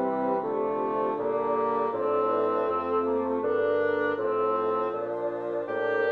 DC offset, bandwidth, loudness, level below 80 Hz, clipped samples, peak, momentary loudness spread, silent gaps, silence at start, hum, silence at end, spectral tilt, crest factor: under 0.1%; 4.7 kHz; -27 LUFS; -70 dBFS; under 0.1%; -14 dBFS; 5 LU; none; 0 s; none; 0 s; -8 dB/octave; 12 dB